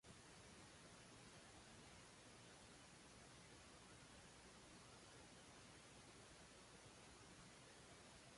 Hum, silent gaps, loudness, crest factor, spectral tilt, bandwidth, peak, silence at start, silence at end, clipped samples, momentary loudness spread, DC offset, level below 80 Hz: none; none; -63 LUFS; 14 dB; -3 dB/octave; 11.5 kHz; -50 dBFS; 0.05 s; 0 s; under 0.1%; 1 LU; under 0.1%; -78 dBFS